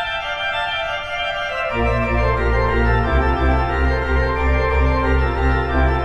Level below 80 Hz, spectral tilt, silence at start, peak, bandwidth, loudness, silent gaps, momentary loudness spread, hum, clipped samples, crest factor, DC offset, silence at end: -22 dBFS; -7 dB/octave; 0 s; -4 dBFS; 6.8 kHz; -19 LUFS; none; 4 LU; none; under 0.1%; 14 dB; under 0.1%; 0 s